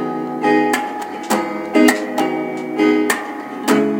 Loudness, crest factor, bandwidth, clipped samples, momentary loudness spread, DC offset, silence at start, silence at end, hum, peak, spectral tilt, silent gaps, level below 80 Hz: -18 LUFS; 18 dB; 17 kHz; under 0.1%; 9 LU; under 0.1%; 0 s; 0 s; none; 0 dBFS; -4 dB/octave; none; -68 dBFS